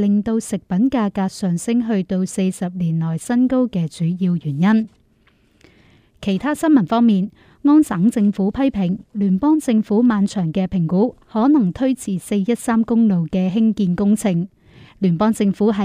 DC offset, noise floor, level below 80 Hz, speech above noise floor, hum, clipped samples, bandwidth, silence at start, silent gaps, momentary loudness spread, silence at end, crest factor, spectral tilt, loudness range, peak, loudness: under 0.1%; -57 dBFS; -50 dBFS; 40 dB; none; under 0.1%; 13.5 kHz; 0 s; none; 6 LU; 0 s; 14 dB; -7 dB/octave; 3 LU; -4 dBFS; -18 LUFS